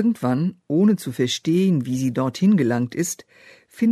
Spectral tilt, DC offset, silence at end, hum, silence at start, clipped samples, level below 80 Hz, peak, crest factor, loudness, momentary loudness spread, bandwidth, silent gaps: -6 dB/octave; under 0.1%; 0 s; none; 0 s; under 0.1%; -64 dBFS; -8 dBFS; 12 dB; -21 LUFS; 6 LU; 13.5 kHz; none